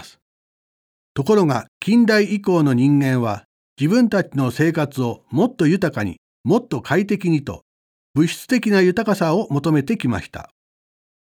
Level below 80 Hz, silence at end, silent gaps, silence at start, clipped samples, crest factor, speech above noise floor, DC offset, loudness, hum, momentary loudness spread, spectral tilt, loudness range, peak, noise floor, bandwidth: -56 dBFS; 0.85 s; 0.22-1.15 s, 1.68-1.81 s, 3.45-3.76 s, 6.18-6.44 s, 7.62-8.14 s; 0 s; under 0.1%; 16 dB; over 72 dB; under 0.1%; -19 LUFS; none; 11 LU; -7 dB/octave; 3 LU; -2 dBFS; under -90 dBFS; 17 kHz